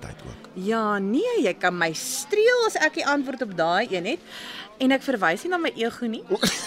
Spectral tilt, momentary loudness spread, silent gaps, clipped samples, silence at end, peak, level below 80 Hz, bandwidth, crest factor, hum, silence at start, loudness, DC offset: -3.5 dB/octave; 12 LU; none; under 0.1%; 0 s; -6 dBFS; -58 dBFS; 16 kHz; 18 dB; none; 0 s; -24 LUFS; under 0.1%